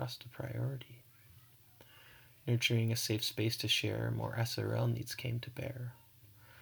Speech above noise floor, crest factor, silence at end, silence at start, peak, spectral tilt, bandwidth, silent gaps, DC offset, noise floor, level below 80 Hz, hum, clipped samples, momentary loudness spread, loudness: 25 dB; 20 dB; 0 s; 0 s; -18 dBFS; -4.5 dB/octave; over 20 kHz; none; under 0.1%; -61 dBFS; -68 dBFS; none; under 0.1%; 15 LU; -36 LUFS